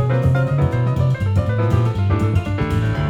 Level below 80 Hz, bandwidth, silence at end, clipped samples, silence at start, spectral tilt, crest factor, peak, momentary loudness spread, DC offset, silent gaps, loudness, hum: -32 dBFS; 9.6 kHz; 0 s; under 0.1%; 0 s; -8.5 dB/octave; 12 dB; -4 dBFS; 3 LU; under 0.1%; none; -18 LUFS; none